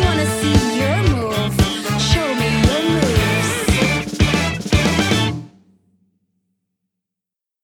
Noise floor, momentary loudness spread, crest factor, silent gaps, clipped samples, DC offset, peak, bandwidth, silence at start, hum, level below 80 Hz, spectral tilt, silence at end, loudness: -85 dBFS; 3 LU; 18 dB; none; under 0.1%; under 0.1%; 0 dBFS; 19.5 kHz; 0 s; none; -30 dBFS; -5 dB/octave; 2.15 s; -17 LUFS